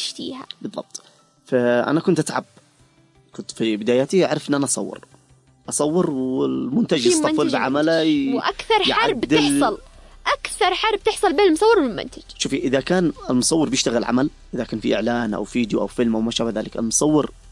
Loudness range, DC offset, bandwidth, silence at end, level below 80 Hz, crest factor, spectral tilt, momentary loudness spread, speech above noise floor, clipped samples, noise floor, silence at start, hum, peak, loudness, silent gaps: 5 LU; under 0.1%; 11.5 kHz; 0 s; -48 dBFS; 14 dB; -4 dB/octave; 13 LU; 36 dB; under 0.1%; -56 dBFS; 0 s; none; -6 dBFS; -20 LUFS; none